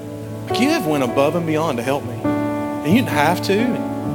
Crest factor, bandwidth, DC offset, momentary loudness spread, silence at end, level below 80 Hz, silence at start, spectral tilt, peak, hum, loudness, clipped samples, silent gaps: 16 dB; 19.5 kHz; under 0.1%; 6 LU; 0 s; -52 dBFS; 0 s; -6 dB/octave; -2 dBFS; none; -19 LUFS; under 0.1%; none